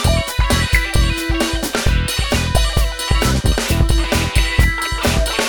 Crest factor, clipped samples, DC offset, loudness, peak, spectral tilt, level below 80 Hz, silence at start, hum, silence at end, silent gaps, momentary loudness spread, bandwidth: 16 dB; under 0.1%; under 0.1%; -17 LUFS; 0 dBFS; -4 dB/octave; -18 dBFS; 0 s; none; 0 s; none; 3 LU; over 20 kHz